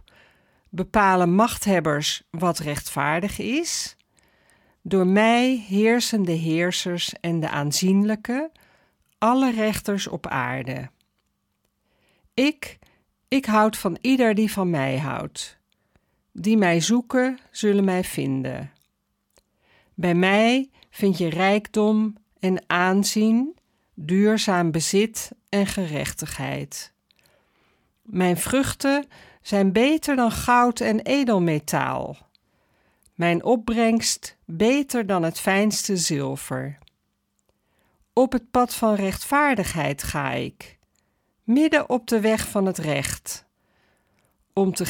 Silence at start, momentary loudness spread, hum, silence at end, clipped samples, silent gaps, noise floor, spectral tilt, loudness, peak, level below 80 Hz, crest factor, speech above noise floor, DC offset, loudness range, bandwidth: 0.75 s; 12 LU; none; 0 s; under 0.1%; none; -73 dBFS; -4.5 dB/octave; -22 LUFS; -6 dBFS; -52 dBFS; 18 dB; 51 dB; under 0.1%; 5 LU; 18 kHz